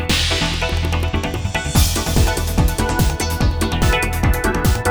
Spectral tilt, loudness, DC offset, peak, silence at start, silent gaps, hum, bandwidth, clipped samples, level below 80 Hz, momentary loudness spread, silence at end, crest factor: -4.5 dB/octave; -18 LUFS; under 0.1%; -2 dBFS; 0 s; none; none; over 20 kHz; under 0.1%; -22 dBFS; 4 LU; 0 s; 16 dB